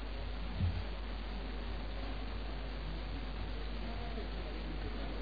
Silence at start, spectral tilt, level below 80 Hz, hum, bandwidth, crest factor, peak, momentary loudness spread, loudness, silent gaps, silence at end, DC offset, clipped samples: 0 s; -5 dB/octave; -42 dBFS; none; 5 kHz; 16 dB; -24 dBFS; 5 LU; -43 LUFS; none; 0 s; 0.4%; under 0.1%